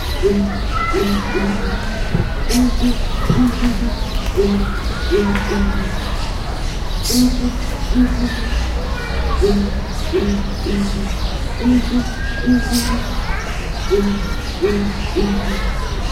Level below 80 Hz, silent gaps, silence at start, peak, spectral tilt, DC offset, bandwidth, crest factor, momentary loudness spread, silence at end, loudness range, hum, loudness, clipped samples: -20 dBFS; none; 0 s; -2 dBFS; -5.5 dB/octave; under 0.1%; 16 kHz; 14 dB; 7 LU; 0 s; 2 LU; none; -19 LUFS; under 0.1%